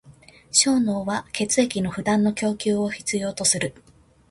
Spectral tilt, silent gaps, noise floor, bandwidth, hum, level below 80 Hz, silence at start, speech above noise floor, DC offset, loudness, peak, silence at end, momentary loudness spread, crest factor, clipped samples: -3 dB/octave; none; -50 dBFS; 11.5 kHz; none; -56 dBFS; 0.05 s; 28 dB; under 0.1%; -22 LUFS; -4 dBFS; 0.6 s; 7 LU; 20 dB; under 0.1%